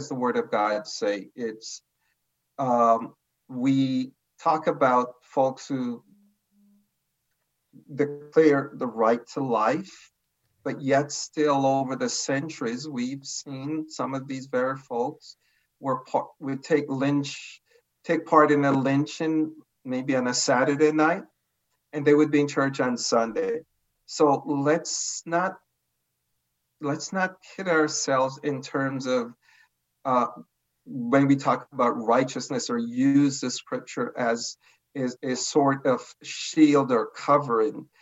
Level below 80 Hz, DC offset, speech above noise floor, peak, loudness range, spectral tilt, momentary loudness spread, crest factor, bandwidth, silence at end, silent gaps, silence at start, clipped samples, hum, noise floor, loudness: -80 dBFS; under 0.1%; 53 dB; -4 dBFS; 5 LU; -5 dB/octave; 13 LU; 22 dB; 8.2 kHz; 0.15 s; none; 0 s; under 0.1%; none; -78 dBFS; -25 LUFS